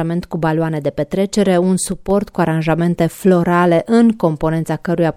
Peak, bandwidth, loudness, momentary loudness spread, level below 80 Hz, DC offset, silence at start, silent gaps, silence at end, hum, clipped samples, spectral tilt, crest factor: -2 dBFS; 15.5 kHz; -16 LUFS; 7 LU; -42 dBFS; under 0.1%; 0 s; none; 0.05 s; none; under 0.1%; -6.5 dB/octave; 14 dB